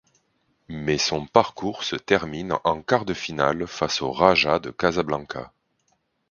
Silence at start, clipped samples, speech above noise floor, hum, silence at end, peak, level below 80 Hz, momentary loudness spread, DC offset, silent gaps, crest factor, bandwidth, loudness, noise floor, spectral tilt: 0.7 s; under 0.1%; 47 dB; none; 0.8 s; 0 dBFS; -52 dBFS; 10 LU; under 0.1%; none; 24 dB; 7.4 kHz; -23 LUFS; -70 dBFS; -4 dB/octave